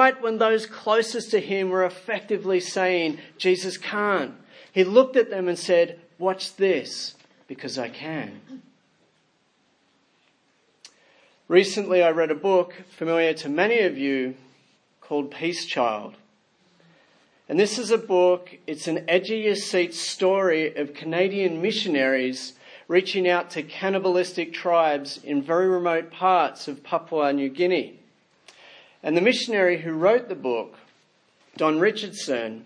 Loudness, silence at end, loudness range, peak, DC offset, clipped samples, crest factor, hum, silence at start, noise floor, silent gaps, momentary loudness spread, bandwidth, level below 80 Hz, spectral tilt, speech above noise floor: -23 LUFS; 0 s; 6 LU; -2 dBFS; under 0.1%; under 0.1%; 22 dB; none; 0 s; -66 dBFS; none; 11 LU; 10.5 kHz; -82 dBFS; -4.5 dB/octave; 43 dB